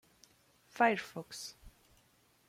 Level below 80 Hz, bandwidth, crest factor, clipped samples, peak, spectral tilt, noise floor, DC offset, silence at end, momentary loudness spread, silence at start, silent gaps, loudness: -68 dBFS; 16 kHz; 24 dB; under 0.1%; -14 dBFS; -3.5 dB/octave; -70 dBFS; under 0.1%; 0.8 s; 17 LU; 0.75 s; none; -34 LUFS